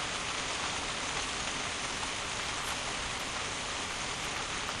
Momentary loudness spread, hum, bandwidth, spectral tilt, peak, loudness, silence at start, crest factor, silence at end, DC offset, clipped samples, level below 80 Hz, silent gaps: 1 LU; none; 13 kHz; -1.5 dB/octave; -20 dBFS; -34 LUFS; 0 s; 16 dB; 0 s; under 0.1%; under 0.1%; -52 dBFS; none